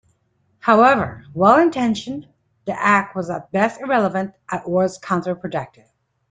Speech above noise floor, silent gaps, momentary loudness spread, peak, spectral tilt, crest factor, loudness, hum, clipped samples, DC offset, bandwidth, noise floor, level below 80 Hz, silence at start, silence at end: 46 dB; none; 15 LU; -2 dBFS; -6 dB/octave; 18 dB; -19 LUFS; none; under 0.1%; under 0.1%; 9.4 kHz; -65 dBFS; -58 dBFS; 0.65 s; 0.65 s